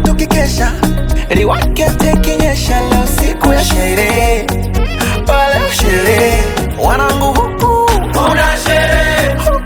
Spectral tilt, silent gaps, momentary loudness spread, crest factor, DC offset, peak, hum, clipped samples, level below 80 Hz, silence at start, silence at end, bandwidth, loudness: -4.5 dB/octave; none; 4 LU; 10 dB; under 0.1%; 0 dBFS; none; under 0.1%; -16 dBFS; 0 s; 0 s; 19.5 kHz; -12 LUFS